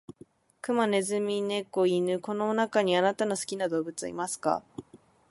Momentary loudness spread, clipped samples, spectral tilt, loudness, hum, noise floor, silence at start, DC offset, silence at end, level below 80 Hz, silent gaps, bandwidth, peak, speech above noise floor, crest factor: 8 LU; under 0.1%; -4.5 dB/octave; -28 LUFS; none; -56 dBFS; 0.65 s; under 0.1%; 0.35 s; -72 dBFS; none; 11.5 kHz; -12 dBFS; 28 dB; 18 dB